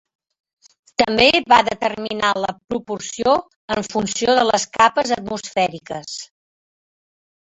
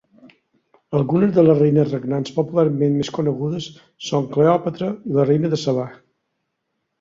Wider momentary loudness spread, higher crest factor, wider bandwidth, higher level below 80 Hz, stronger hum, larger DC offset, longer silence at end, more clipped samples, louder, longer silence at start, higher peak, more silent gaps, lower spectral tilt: first, 14 LU vs 11 LU; about the same, 20 dB vs 18 dB; first, 8.4 kHz vs 7.6 kHz; first, -52 dBFS vs -60 dBFS; neither; neither; first, 1.35 s vs 1.05 s; neither; about the same, -18 LUFS vs -19 LUFS; first, 1 s vs 0.25 s; about the same, 0 dBFS vs -2 dBFS; first, 2.64-2.68 s, 3.56-3.68 s vs none; second, -3 dB/octave vs -7.5 dB/octave